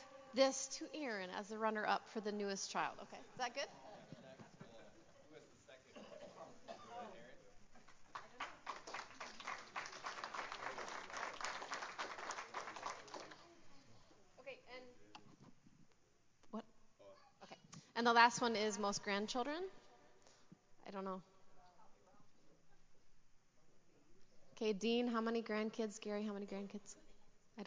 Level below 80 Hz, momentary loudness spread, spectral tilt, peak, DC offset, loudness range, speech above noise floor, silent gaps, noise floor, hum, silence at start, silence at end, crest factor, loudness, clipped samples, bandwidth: -80 dBFS; 22 LU; -3 dB/octave; -16 dBFS; under 0.1%; 20 LU; 31 dB; none; -71 dBFS; none; 0 s; 0 s; 28 dB; -42 LUFS; under 0.1%; 7.8 kHz